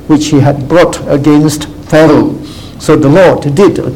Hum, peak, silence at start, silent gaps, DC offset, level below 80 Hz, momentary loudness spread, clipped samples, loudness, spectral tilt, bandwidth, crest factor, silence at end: none; 0 dBFS; 0.05 s; none; 1%; -32 dBFS; 11 LU; 2%; -7 LUFS; -6.5 dB/octave; 16.5 kHz; 8 dB; 0 s